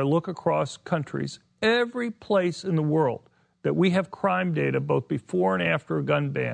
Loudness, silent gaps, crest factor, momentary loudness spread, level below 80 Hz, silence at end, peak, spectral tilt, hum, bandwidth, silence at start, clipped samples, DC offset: -26 LUFS; none; 16 dB; 7 LU; -66 dBFS; 0 s; -10 dBFS; -7 dB/octave; none; 9.8 kHz; 0 s; under 0.1%; under 0.1%